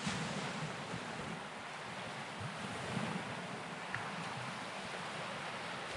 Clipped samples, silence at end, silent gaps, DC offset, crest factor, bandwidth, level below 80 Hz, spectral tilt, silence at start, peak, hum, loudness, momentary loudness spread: under 0.1%; 0 s; none; under 0.1%; 20 dB; 11.5 kHz; -72 dBFS; -4 dB/octave; 0 s; -24 dBFS; none; -42 LUFS; 4 LU